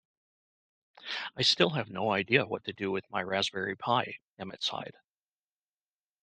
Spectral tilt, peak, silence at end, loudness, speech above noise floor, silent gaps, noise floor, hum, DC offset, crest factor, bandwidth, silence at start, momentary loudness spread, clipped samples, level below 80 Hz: -4 dB/octave; -8 dBFS; 1.35 s; -30 LUFS; over 59 dB; 4.22-4.37 s; under -90 dBFS; none; under 0.1%; 26 dB; 9.4 kHz; 1 s; 15 LU; under 0.1%; -74 dBFS